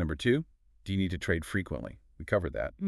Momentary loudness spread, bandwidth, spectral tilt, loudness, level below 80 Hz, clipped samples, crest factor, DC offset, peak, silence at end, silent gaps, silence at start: 18 LU; 13 kHz; -6.5 dB/octave; -32 LUFS; -46 dBFS; under 0.1%; 20 dB; under 0.1%; -12 dBFS; 0 s; none; 0 s